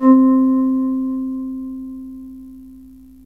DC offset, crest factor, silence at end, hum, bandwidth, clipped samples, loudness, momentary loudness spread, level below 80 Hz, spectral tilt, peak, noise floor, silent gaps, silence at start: 0.2%; 14 dB; 0.4 s; none; 1.9 kHz; under 0.1%; -17 LUFS; 24 LU; -52 dBFS; -9.5 dB/octave; -4 dBFS; -42 dBFS; none; 0 s